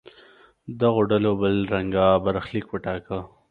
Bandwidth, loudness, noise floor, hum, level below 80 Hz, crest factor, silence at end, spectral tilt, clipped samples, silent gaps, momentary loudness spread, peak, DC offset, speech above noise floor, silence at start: 4.8 kHz; -23 LUFS; -53 dBFS; none; -48 dBFS; 20 dB; 0.25 s; -9.5 dB/octave; under 0.1%; none; 12 LU; -4 dBFS; under 0.1%; 31 dB; 0.05 s